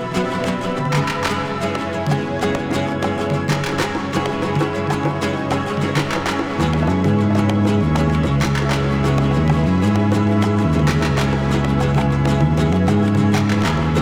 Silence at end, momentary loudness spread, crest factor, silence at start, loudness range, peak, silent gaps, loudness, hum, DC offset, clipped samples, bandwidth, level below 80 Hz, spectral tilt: 0 s; 5 LU; 16 dB; 0 s; 4 LU; -2 dBFS; none; -18 LUFS; none; under 0.1%; under 0.1%; 15 kHz; -32 dBFS; -6.5 dB/octave